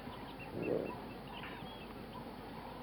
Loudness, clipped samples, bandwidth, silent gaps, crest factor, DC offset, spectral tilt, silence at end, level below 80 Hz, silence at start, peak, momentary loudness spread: -44 LUFS; under 0.1%; over 20 kHz; none; 20 dB; under 0.1%; -6.5 dB/octave; 0 s; -60 dBFS; 0 s; -24 dBFS; 10 LU